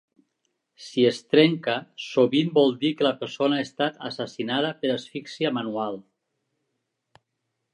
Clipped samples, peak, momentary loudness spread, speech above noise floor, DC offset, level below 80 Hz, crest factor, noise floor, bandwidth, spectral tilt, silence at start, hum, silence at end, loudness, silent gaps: under 0.1%; -4 dBFS; 12 LU; 56 dB; under 0.1%; -76 dBFS; 22 dB; -79 dBFS; 10.5 kHz; -6 dB/octave; 0.8 s; none; 1.7 s; -24 LUFS; none